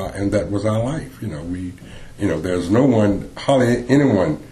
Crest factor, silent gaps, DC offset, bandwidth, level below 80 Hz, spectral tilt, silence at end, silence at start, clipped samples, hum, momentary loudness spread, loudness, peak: 18 dB; none; under 0.1%; 12.5 kHz; -40 dBFS; -7 dB/octave; 0 s; 0 s; under 0.1%; none; 14 LU; -19 LUFS; -2 dBFS